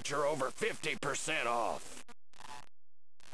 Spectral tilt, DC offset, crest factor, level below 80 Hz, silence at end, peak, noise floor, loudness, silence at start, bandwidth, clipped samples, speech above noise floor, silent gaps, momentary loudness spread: -2.5 dB/octave; 0.7%; 16 dB; -66 dBFS; 0 s; -20 dBFS; under -90 dBFS; -35 LUFS; 0 s; 11 kHz; under 0.1%; over 54 dB; none; 19 LU